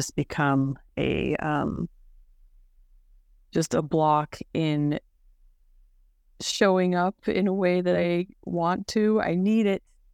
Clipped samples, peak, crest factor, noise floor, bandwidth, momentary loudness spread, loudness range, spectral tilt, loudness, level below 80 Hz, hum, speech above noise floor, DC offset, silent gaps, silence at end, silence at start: under 0.1%; -6 dBFS; 20 dB; -60 dBFS; 15.5 kHz; 9 LU; 5 LU; -6 dB/octave; -25 LUFS; -52 dBFS; none; 35 dB; under 0.1%; none; 0.35 s; 0 s